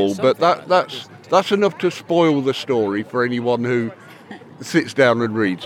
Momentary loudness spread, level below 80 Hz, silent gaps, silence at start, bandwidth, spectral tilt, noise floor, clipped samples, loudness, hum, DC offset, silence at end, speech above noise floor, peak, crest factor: 13 LU; -76 dBFS; none; 0 s; 16 kHz; -5.5 dB/octave; -39 dBFS; under 0.1%; -19 LUFS; none; under 0.1%; 0 s; 21 dB; -2 dBFS; 18 dB